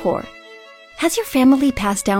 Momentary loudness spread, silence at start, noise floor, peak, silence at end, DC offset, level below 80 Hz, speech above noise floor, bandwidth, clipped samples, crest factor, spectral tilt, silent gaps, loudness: 11 LU; 0 s; -42 dBFS; -4 dBFS; 0 s; under 0.1%; -42 dBFS; 25 dB; 17 kHz; under 0.1%; 16 dB; -4.5 dB/octave; none; -17 LUFS